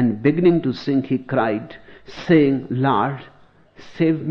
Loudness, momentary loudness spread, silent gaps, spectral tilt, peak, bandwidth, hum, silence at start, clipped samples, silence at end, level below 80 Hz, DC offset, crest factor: -19 LUFS; 16 LU; none; -9 dB/octave; -2 dBFS; 6.4 kHz; none; 0 s; under 0.1%; 0 s; -54 dBFS; under 0.1%; 16 dB